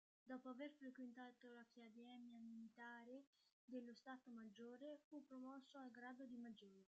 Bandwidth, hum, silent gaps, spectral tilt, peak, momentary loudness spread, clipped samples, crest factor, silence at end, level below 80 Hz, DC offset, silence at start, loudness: 7.6 kHz; none; 3.27-3.33 s, 3.53-3.68 s, 5.04-5.11 s; -3.5 dB/octave; -42 dBFS; 7 LU; under 0.1%; 18 dB; 0.15 s; under -90 dBFS; under 0.1%; 0.25 s; -60 LUFS